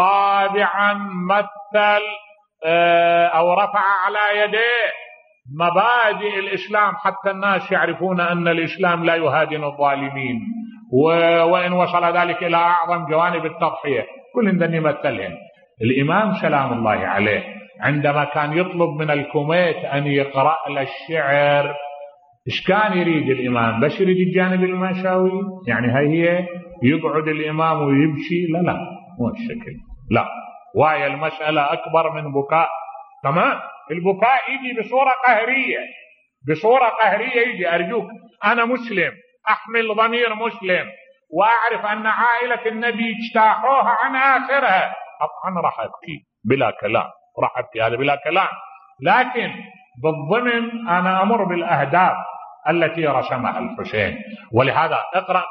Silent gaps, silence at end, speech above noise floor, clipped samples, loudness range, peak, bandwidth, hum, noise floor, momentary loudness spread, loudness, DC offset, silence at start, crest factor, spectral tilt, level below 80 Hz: none; 0 s; 22 dB; under 0.1%; 3 LU; -2 dBFS; 6.2 kHz; none; -41 dBFS; 10 LU; -19 LUFS; under 0.1%; 0 s; 18 dB; -8.5 dB/octave; -58 dBFS